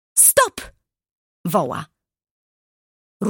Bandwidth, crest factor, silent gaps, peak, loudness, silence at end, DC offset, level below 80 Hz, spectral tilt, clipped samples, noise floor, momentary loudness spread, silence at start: 17 kHz; 22 dB; 1.11-1.44 s, 2.31-3.20 s; -2 dBFS; -16 LUFS; 0 s; under 0.1%; -56 dBFS; -2.5 dB/octave; under 0.1%; -45 dBFS; 20 LU; 0.15 s